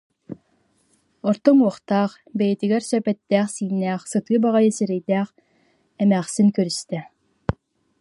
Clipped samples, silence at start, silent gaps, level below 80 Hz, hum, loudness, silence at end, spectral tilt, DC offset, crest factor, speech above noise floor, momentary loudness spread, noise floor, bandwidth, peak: under 0.1%; 0.3 s; none; -54 dBFS; none; -21 LUFS; 0.5 s; -6 dB/octave; under 0.1%; 20 dB; 45 dB; 14 LU; -64 dBFS; 11.5 kHz; -2 dBFS